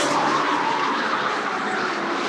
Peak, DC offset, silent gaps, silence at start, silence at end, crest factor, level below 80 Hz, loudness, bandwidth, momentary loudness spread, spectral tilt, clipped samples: -10 dBFS; under 0.1%; none; 0 s; 0 s; 14 dB; -74 dBFS; -22 LUFS; 13.5 kHz; 4 LU; -3 dB/octave; under 0.1%